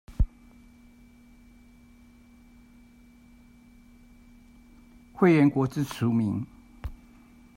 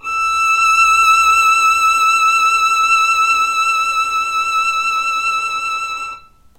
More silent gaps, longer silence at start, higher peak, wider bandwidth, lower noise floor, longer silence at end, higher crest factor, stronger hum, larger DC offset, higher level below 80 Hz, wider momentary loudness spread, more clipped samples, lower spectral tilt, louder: neither; about the same, 0.1 s vs 0.05 s; second, -8 dBFS vs -2 dBFS; about the same, 16 kHz vs 16 kHz; first, -54 dBFS vs -35 dBFS; first, 0.6 s vs 0.4 s; first, 22 dB vs 12 dB; neither; neither; first, -40 dBFS vs -50 dBFS; first, 23 LU vs 9 LU; neither; first, -8 dB/octave vs 2 dB/octave; second, -25 LUFS vs -12 LUFS